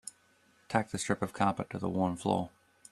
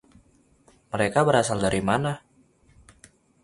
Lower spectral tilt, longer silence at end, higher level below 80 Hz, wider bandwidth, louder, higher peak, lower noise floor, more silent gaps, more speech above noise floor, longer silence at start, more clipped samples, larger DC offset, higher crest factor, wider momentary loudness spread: about the same, -5.5 dB/octave vs -5 dB/octave; second, 0.45 s vs 1.25 s; second, -66 dBFS vs -52 dBFS; first, 13.5 kHz vs 11.5 kHz; second, -33 LUFS vs -24 LUFS; second, -10 dBFS vs -6 dBFS; first, -67 dBFS vs -60 dBFS; neither; about the same, 35 dB vs 37 dB; second, 0.05 s vs 0.95 s; neither; neither; about the same, 24 dB vs 22 dB; second, 5 LU vs 12 LU